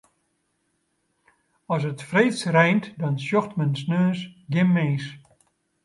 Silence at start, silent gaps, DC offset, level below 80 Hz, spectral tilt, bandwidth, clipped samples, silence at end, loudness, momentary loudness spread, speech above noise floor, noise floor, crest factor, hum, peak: 1.7 s; none; under 0.1%; -68 dBFS; -7 dB/octave; 11.5 kHz; under 0.1%; 0.65 s; -23 LUFS; 9 LU; 50 dB; -72 dBFS; 20 dB; none; -6 dBFS